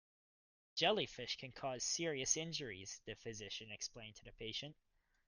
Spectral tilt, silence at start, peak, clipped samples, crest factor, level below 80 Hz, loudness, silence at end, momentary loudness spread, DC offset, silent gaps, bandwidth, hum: -2 dB/octave; 0.75 s; -20 dBFS; under 0.1%; 24 dB; -70 dBFS; -42 LUFS; 0.55 s; 13 LU; under 0.1%; none; 10.5 kHz; none